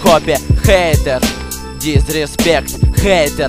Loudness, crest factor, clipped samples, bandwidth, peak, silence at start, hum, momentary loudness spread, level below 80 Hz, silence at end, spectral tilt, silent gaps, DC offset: -13 LUFS; 12 dB; under 0.1%; 16.5 kHz; 0 dBFS; 0 s; none; 7 LU; -20 dBFS; 0 s; -5 dB/octave; none; 1%